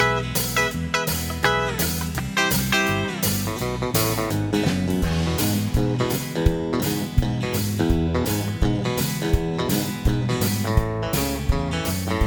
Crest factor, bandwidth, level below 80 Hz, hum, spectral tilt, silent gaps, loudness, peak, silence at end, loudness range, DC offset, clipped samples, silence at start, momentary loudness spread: 18 dB; 19.5 kHz; -30 dBFS; none; -4.5 dB/octave; none; -23 LUFS; -4 dBFS; 0 s; 1 LU; under 0.1%; under 0.1%; 0 s; 4 LU